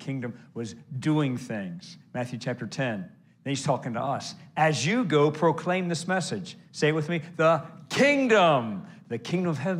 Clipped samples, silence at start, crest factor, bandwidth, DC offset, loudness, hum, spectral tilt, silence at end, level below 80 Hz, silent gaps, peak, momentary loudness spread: under 0.1%; 0 s; 18 dB; 12 kHz; under 0.1%; -26 LUFS; none; -5.5 dB/octave; 0 s; -74 dBFS; none; -8 dBFS; 16 LU